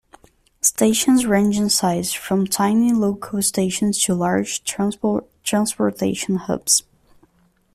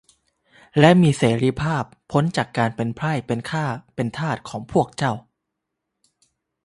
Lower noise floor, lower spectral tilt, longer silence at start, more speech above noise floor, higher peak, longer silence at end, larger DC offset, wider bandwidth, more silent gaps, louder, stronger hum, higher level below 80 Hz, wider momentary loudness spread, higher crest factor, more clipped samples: second, -60 dBFS vs -80 dBFS; second, -4 dB/octave vs -6.5 dB/octave; about the same, 0.65 s vs 0.75 s; second, 41 dB vs 60 dB; about the same, -2 dBFS vs 0 dBFS; second, 0.95 s vs 1.45 s; neither; first, 15.5 kHz vs 11.5 kHz; neither; about the same, -19 LUFS vs -21 LUFS; neither; about the same, -54 dBFS vs -52 dBFS; second, 7 LU vs 12 LU; about the same, 18 dB vs 22 dB; neither